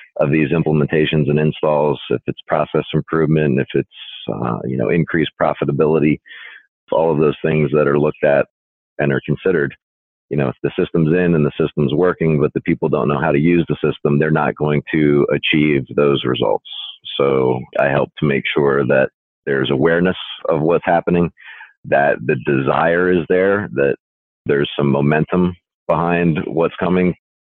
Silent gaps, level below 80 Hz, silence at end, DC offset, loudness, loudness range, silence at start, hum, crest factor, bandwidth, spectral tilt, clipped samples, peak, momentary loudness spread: 6.68-6.87 s, 8.50-8.96 s, 9.82-10.28 s, 19.14-19.43 s, 21.77-21.83 s, 23.99-24.45 s, 25.74-25.86 s; -46 dBFS; 0.3 s; under 0.1%; -17 LUFS; 2 LU; 0.15 s; none; 12 dB; 4.2 kHz; -10.5 dB/octave; under 0.1%; -4 dBFS; 7 LU